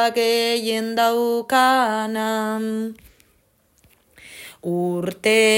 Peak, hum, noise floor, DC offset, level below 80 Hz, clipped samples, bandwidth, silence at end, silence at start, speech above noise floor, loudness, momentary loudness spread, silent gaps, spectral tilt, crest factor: -6 dBFS; none; -61 dBFS; under 0.1%; -64 dBFS; under 0.1%; 16.5 kHz; 0 s; 0 s; 42 dB; -20 LUFS; 15 LU; none; -3.5 dB/octave; 14 dB